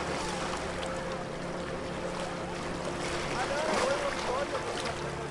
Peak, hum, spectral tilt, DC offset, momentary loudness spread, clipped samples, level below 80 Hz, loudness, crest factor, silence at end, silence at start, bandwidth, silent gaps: -16 dBFS; none; -4 dB/octave; under 0.1%; 7 LU; under 0.1%; -50 dBFS; -33 LUFS; 16 dB; 0 s; 0 s; 11.5 kHz; none